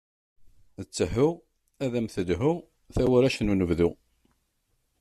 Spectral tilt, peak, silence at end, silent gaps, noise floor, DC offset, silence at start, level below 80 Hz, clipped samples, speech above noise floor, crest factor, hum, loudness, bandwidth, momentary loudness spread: -6.5 dB/octave; -10 dBFS; 1.05 s; none; -73 dBFS; under 0.1%; 0.45 s; -46 dBFS; under 0.1%; 48 dB; 18 dB; none; -26 LUFS; 13.5 kHz; 12 LU